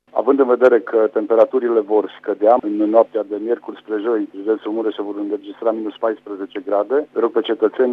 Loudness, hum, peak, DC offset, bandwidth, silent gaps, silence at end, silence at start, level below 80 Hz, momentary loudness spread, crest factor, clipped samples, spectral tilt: -18 LUFS; 50 Hz at -70 dBFS; 0 dBFS; under 0.1%; 4.5 kHz; none; 0 s; 0.15 s; -72 dBFS; 10 LU; 18 dB; under 0.1%; -7 dB/octave